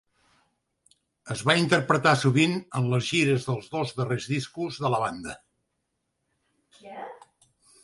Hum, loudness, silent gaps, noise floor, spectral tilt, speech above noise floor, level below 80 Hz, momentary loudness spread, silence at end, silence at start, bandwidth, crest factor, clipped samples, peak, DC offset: none; -25 LUFS; none; -79 dBFS; -5 dB/octave; 53 dB; -64 dBFS; 20 LU; 0.7 s; 1.25 s; 11.5 kHz; 22 dB; under 0.1%; -4 dBFS; under 0.1%